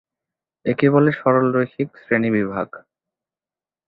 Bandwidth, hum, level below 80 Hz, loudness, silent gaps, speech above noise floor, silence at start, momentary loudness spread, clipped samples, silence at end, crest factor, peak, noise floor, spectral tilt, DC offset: 4.8 kHz; none; -60 dBFS; -19 LUFS; none; over 71 dB; 0.65 s; 12 LU; under 0.1%; 1.1 s; 18 dB; -2 dBFS; under -90 dBFS; -11 dB/octave; under 0.1%